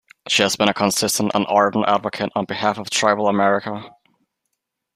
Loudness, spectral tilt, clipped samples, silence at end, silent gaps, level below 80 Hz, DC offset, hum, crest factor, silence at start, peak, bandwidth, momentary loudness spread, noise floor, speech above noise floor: -19 LUFS; -3 dB/octave; under 0.1%; 1.05 s; none; -60 dBFS; under 0.1%; none; 18 dB; 0.25 s; -2 dBFS; 15.5 kHz; 6 LU; -77 dBFS; 58 dB